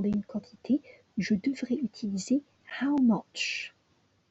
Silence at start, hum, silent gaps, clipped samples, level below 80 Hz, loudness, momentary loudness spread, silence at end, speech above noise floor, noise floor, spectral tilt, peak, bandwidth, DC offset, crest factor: 0 s; none; none; under 0.1%; -66 dBFS; -30 LUFS; 13 LU; 0.6 s; 40 dB; -69 dBFS; -5 dB/octave; -16 dBFS; 8.2 kHz; under 0.1%; 16 dB